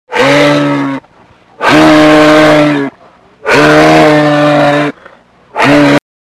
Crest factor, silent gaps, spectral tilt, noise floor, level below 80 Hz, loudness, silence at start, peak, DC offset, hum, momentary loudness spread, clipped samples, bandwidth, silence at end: 8 dB; none; -5.5 dB/octave; -42 dBFS; -40 dBFS; -6 LUFS; 0.1 s; 0 dBFS; under 0.1%; none; 13 LU; 3%; 15 kHz; 0.25 s